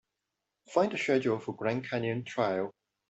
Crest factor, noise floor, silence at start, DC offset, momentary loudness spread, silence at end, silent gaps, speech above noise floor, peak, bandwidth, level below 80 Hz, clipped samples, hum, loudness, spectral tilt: 20 dB; -86 dBFS; 0.7 s; under 0.1%; 5 LU; 0.4 s; none; 55 dB; -12 dBFS; 8.2 kHz; -72 dBFS; under 0.1%; none; -31 LUFS; -6 dB/octave